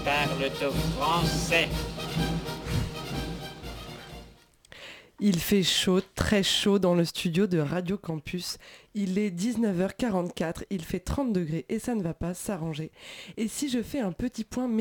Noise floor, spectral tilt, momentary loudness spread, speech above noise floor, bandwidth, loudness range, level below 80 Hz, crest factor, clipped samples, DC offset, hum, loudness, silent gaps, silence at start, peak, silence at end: -54 dBFS; -5 dB/octave; 16 LU; 26 dB; 19 kHz; 7 LU; -44 dBFS; 20 dB; under 0.1%; under 0.1%; none; -28 LUFS; none; 0 s; -10 dBFS; 0 s